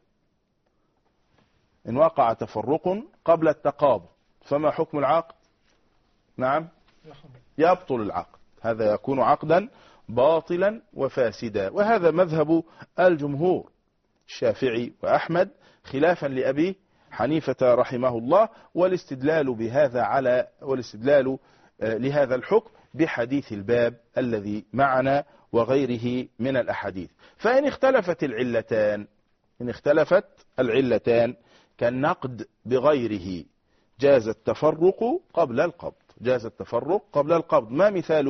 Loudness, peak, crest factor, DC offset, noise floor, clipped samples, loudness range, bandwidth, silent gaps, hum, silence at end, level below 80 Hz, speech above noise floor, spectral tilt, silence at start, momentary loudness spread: -24 LUFS; -6 dBFS; 18 dB; under 0.1%; -71 dBFS; under 0.1%; 3 LU; 6.4 kHz; none; none; 0 s; -60 dBFS; 48 dB; -5.5 dB/octave; 1.85 s; 10 LU